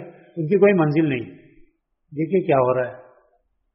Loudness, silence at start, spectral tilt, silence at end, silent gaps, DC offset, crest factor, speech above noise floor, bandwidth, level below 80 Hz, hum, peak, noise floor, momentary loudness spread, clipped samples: -20 LUFS; 0 s; -7.5 dB/octave; 0.75 s; none; under 0.1%; 18 dB; 46 dB; 5.6 kHz; -62 dBFS; none; -4 dBFS; -65 dBFS; 18 LU; under 0.1%